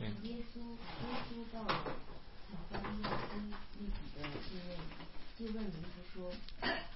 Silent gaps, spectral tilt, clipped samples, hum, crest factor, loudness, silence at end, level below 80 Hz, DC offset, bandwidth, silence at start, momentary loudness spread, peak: none; -3.5 dB/octave; under 0.1%; none; 20 dB; -45 LUFS; 0 s; -50 dBFS; 0.3%; 5.8 kHz; 0 s; 12 LU; -22 dBFS